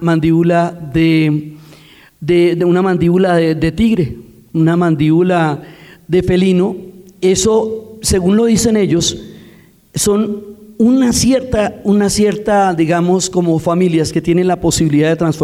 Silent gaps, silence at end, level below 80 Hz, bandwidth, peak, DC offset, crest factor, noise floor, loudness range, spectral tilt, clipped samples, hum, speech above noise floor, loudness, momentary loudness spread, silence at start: none; 0 s; -36 dBFS; 15 kHz; -2 dBFS; under 0.1%; 10 dB; -43 dBFS; 2 LU; -5.5 dB/octave; under 0.1%; none; 31 dB; -13 LUFS; 8 LU; 0 s